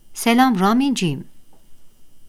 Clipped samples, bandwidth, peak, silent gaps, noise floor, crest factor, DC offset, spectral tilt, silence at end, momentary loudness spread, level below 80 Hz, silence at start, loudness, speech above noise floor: under 0.1%; 15.5 kHz; -2 dBFS; none; -39 dBFS; 18 dB; under 0.1%; -5 dB/octave; 0 s; 9 LU; -54 dBFS; 0.1 s; -17 LUFS; 22 dB